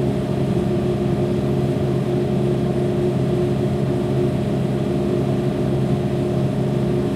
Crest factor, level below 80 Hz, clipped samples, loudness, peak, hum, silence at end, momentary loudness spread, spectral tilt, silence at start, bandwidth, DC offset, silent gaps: 12 dB; -38 dBFS; under 0.1%; -20 LUFS; -8 dBFS; none; 0 s; 1 LU; -8.5 dB/octave; 0 s; 12.5 kHz; under 0.1%; none